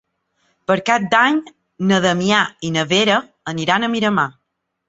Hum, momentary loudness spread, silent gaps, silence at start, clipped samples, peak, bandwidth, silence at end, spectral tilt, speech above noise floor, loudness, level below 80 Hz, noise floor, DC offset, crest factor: none; 9 LU; none; 0.7 s; under 0.1%; -2 dBFS; 8 kHz; 0.6 s; -4.5 dB/octave; 49 dB; -17 LUFS; -58 dBFS; -66 dBFS; under 0.1%; 18 dB